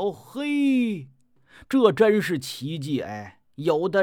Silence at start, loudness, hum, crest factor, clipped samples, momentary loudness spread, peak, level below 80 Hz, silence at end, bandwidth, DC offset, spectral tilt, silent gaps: 0 s; -24 LUFS; none; 20 dB; under 0.1%; 15 LU; -4 dBFS; -66 dBFS; 0 s; 17.5 kHz; under 0.1%; -6 dB/octave; none